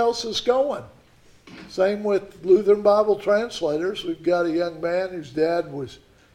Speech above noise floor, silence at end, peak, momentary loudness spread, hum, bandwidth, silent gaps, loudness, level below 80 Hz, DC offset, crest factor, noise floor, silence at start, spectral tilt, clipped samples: 31 dB; 0.4 s; -6 dBFS; 11 LU; none; 12.5 kHz; none; -22 LUFS; -58 dBFS; under 0.1%; 16 dB; -53 dBFS; 0 s; -5 dB/octave; under 0.1%